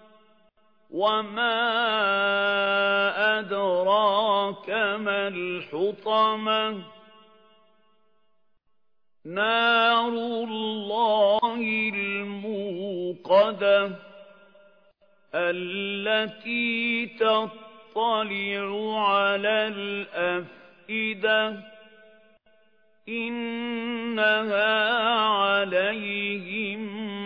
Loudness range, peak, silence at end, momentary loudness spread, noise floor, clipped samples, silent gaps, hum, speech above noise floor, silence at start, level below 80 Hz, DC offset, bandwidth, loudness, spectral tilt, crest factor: 6 LU; -8 dBFS; 0 s; 10 LU; -81 dBFS; under 0.1%; none; none; 57 dB; 0.9 s; -78 dBFS; under 0.1%; 5.4 kHz; -24 LUFS; -6.5 dB/octave; 18 dB